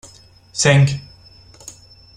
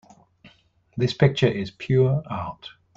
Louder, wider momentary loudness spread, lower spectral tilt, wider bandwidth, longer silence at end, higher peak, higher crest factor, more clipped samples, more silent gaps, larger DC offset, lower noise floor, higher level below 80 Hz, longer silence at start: first, -15 LUFS vs -23 LUFS; first, 25 LU vs 16 LU; second, -4.5 dB/octave vs -7.5 dB/octave; first, 10.5 kHz vs 7.4 kHz; first, 0.45 s vs 0.25 s; first, 0 dBFS vs -4 dBFS; about the same, 20 dB vs 20 dB; neither; neither; neither; second, -46 dBFS vs -58 dBFS; about the same, -50 dBFS vs -54 dBFS; about the same, 0.55 s vs 0.45 s